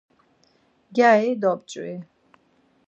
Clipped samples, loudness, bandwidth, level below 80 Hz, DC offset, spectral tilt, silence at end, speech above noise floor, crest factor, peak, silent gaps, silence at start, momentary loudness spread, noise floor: under 0.1%; -21 LUFS; 8.2 kHz; -78 dBFS; under 0.1%; -5.5 dB/octave; 0.85 s; 42 dB; 20 dB; -4 dBFS; none; 0.9 s; 18 LU; -63 dBFS